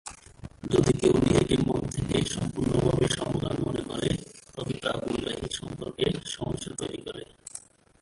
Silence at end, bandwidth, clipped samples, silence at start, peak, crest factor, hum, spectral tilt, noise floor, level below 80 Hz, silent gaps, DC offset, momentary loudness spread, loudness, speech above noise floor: 0.4 s; 11.5 kHz; under 0.1%; 0.05 s; -8 dBFS; 20 dB; none; -5.5 dB/octave; -48 dBFS; -46 dBFS; none; under 0.1%; 19 LU; -28 LUFS; 21 dB